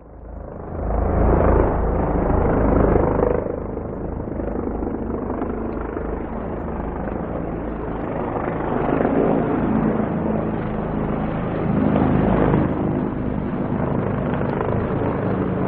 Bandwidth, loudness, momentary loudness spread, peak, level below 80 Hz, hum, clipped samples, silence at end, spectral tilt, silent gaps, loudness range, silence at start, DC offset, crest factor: 4 kHz; -22 LUFS; 10 LU; -2 dBFS; -30 dBFS; none; under 0.1%; 0 s; -13 dB/octave; none; 7 LU; 0 s; under 0.1%; 20 dB